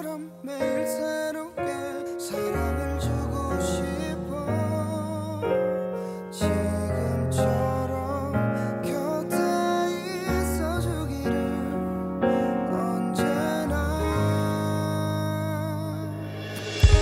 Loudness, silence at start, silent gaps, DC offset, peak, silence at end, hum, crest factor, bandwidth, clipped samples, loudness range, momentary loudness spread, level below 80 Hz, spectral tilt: -27 LUFS; 0 s; none; under 0.1%; -4 dBFS; 0 s; none; 22 dB; 16 kHz; under 0.1%; 3 LU; 7 LU; -34 dBFS; -6.5 dB/octave